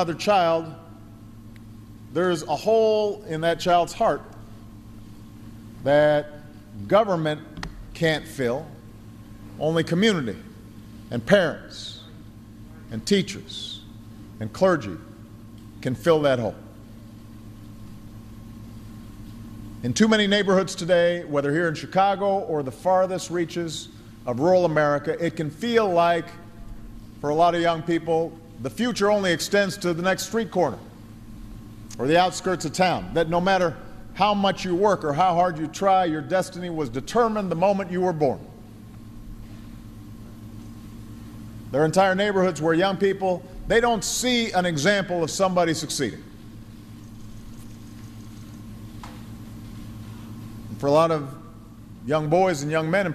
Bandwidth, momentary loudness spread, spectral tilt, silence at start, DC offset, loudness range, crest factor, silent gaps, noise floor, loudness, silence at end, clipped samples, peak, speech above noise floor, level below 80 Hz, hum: 14.5 kHz; 24 LU; -5 dB/octave; 0 s; under 0.1%; 8 LU; 22 dB; none; -43 dBFS; -23 LUFS; 0 s; under 0.1%; -4 dBFS; 21 dB; -48 dBFS; none